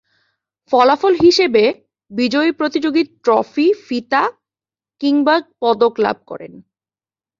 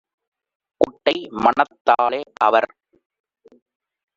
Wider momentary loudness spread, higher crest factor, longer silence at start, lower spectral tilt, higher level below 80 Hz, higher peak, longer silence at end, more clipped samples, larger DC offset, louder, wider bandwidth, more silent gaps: first, 10 LU vs 5 LU; about the same, 16 dB vs 20 dB; about the same, 0.7 s vs 0.8 s; first, -4.5 dB/octave vs -1.5 dB/octave; about the same, -58 dBFS vs -62 dBFS; about the same, 0 dBFS vs -2 dBFS; second, 0.8 s vs 1.5 s; neither; neither; first, -15 LUFS vs -19 LUFS; about the same, 7.6 kHz vs 7.6 kHz; second, none vs 1.81-1.85 s